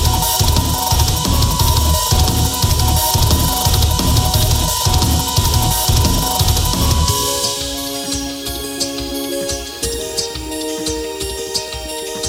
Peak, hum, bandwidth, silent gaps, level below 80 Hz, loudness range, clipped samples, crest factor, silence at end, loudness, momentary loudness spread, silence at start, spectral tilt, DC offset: -2 dBFS; none; 16.5 kHz; none; -22 dBFS; 7 LU; under 0.1%; 14 dB; 0 s; -16 LUFS; 8 LU; 0 s; -3.5 dB/octave; under 0.1%